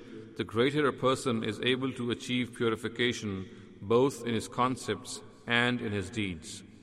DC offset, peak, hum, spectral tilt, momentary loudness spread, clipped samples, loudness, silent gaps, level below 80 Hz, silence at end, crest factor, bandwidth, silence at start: under 0.1%; -10 dBFS; none; -5 dB/octave; 14 LU; under 0.1%; -31 LUFS; none; -62 dBFS; 0.05 s; 20 dB; 14 kHz; 0 s